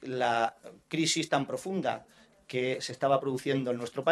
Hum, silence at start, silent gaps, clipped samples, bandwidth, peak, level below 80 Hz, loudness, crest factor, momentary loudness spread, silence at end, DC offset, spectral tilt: none; 0 s; none; under 0.1%; 13 kHz; -10 dBFS; -74 dBFS; -31 LUFS; 20 dB; 6 LU; 0 s; under 0.1%; -4 dB/octave